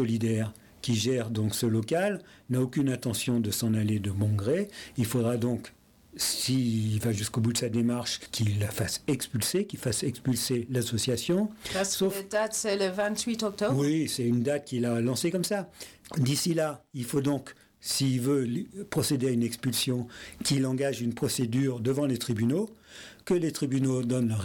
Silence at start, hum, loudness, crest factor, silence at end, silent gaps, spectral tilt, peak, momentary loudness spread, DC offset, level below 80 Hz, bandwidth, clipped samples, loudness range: 0 s; none; -29 LUFS; 10 dB; 0 s; none; -5 dB/octave; -18 dBFS; 6 LU; under 0.1%; -62 dBFS; 18.5 kHz; under 0.1%; 1 LU